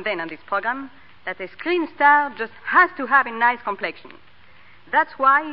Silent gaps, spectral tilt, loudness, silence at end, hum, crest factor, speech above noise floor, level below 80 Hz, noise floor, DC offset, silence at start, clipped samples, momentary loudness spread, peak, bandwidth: none; -7.5 dB/octave; -20 LUFS; 0 s; none; 18 dB; 31 dB; -66 dBFS; -51 dBFS; 0.5%; 0 s; under 0.1%; 15 LU; -4 dBFS; 5.4 kHz